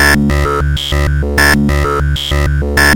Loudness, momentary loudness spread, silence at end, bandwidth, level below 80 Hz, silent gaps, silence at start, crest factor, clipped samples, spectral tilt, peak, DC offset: -12 LUFS; 5 LU; 0 s; 18.5 kHz; -16 dBFS; none; 0 s; 10 dB; under 0.1%; -4.5 dB/octave; 0 dBFS; under 0.1%